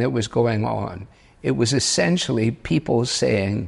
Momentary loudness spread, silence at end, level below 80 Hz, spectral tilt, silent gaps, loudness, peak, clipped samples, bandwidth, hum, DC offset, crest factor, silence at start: 9 LU; 0 s; -48 dBFS; -4.5 dB/octave; none; -21 LUFS; -6 dBFS; under 0.1%; 11.5 kHz; none; under 0.1%; 14 dB; 0 s